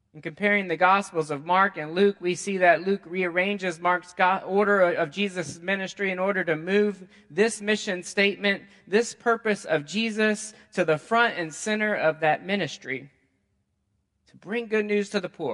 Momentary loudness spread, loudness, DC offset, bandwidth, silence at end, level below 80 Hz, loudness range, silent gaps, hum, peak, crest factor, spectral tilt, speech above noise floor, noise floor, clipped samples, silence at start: 9 LU; -25 LUFS; under 0.1%; 11.5 kHz; 0 s; -72 dBFS; 5 LU; none; none; -4 dBFS; 22 dB; -4.5 dB/octave; 49 dB; -74 dBFS; under 0.1%; 0.15 s